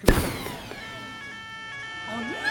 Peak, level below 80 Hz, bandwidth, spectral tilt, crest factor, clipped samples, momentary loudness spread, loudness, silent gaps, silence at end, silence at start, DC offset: -2 dBFS; -34 dBFS; 18 kHz; -4.5 dB/octave; 26 dB; under 0.1%; 10 LU; -32 LUFS; none; 0 s; 0 s; under 0.1%